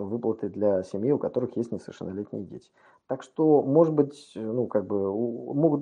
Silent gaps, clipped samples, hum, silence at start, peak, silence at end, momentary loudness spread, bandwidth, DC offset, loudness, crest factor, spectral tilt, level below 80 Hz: none; under 0.1%; none; 0 s; -8 dBFS; 0 s; 15 LU; 10 kHz; under 0.1%; -27 LUFS; 18 dB; -9.5 dB/octave; -72 dBFS